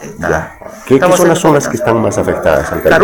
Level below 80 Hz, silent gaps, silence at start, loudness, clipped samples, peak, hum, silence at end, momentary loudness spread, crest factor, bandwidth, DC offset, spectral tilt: -34 dBFS; none; 0 s; -11 LUFS; 0.4%; 0 dBFS; none; 0 s; 8 LU; 10 dB; 18 kHz; under 0.1%; -5 dB/octave